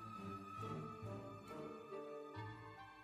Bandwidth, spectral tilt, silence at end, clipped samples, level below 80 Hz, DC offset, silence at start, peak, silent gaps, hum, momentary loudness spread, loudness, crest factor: 15 kHz; -7 dB/octave; 0 s; under 0.1%; -76 dBFS; under 0.1%; 0 s; -36 dBFS; none; none; 5 LU; -51 LUFS; 16 dB